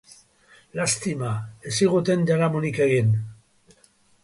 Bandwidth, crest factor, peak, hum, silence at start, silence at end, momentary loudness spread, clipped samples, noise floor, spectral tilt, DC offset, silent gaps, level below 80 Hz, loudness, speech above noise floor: 11.5 kHz; 16 dB; -8 dBFS; none; 0.75 s; 0.9 s; 10 LU; under 0.1%; -59 dBFS; -5.5 dB/octave; under 0.1%; none; -58 dBFS; -23 LUFS; 37 dB